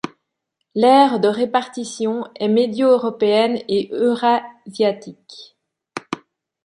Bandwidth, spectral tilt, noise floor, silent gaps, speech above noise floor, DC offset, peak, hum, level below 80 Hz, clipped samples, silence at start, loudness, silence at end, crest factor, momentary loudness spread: 10.5 kHz; -5 dB/octave; -76 dBFS; none; 59 dB; under 0.1%; -2 dBFS; none; -68 dBFS; under 0.1%; 0.05 s; -18 LUFS; 0.5 s; 18 dB; 19 LU